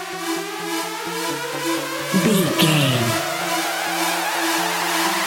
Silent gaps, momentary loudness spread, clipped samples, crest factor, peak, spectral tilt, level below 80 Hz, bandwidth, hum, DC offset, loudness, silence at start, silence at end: none; 9 LU; under 0.1%; 18 dB; -2 dBFS; -3.5 dB/octave; -62 dBFS; 17 kHz; none; under 0.1%; -20 LUFS; 0 s; 0 s